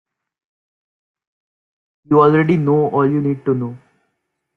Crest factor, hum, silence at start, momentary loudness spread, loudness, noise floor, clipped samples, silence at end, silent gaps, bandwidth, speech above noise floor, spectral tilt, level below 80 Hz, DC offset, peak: 16 dB; none; 2.1 s; 9 LU; -15 LUFS; -73 dBFS; under 0.1%; 0.8 s; none; 4.7 kHz; 58 dB; -10 dB/octave; -58 dBFS; under 0.1%; -2 dBFS